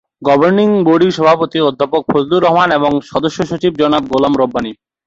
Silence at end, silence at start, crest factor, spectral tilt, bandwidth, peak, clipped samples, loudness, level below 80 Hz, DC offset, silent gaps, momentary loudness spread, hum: 0.35 s; 0.2 s; 12 dB; -6.5 dB/octave; 7.8 kHz; 0 dBFS; under 0.1%; -13 LUFS; -48 dBFS; under 0.1%; none; 6 LU; none